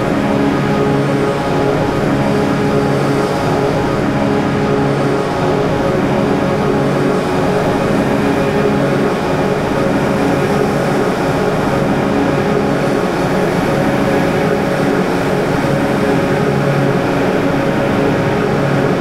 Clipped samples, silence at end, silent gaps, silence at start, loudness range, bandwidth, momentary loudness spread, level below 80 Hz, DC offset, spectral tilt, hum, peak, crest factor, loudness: under 0.1%; 0 s; none; 0 s; 0 LU; 15.5 kHz; 1 LU; -36 dBFS; 0.3%; -6.5 dB/octave; none; -2 dBFS; 12 dB; -14 LUFS